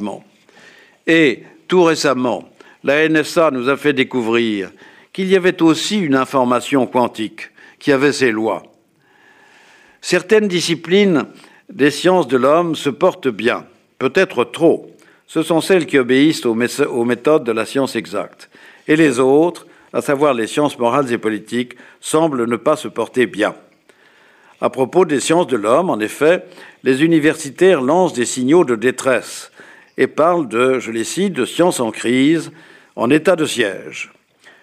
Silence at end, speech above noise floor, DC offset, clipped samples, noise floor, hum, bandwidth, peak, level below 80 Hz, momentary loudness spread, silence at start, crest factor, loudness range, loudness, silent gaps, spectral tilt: 0.55 s; 39 dB; under 0.1%; under 0.1%; -54 dBFS; none; 15.5 kHz; -2 dBFS; -64 dBFS; 12 LU; 0 s; 14 dB; 3 LU; -16 LUFS; none; -4.5 dB/octave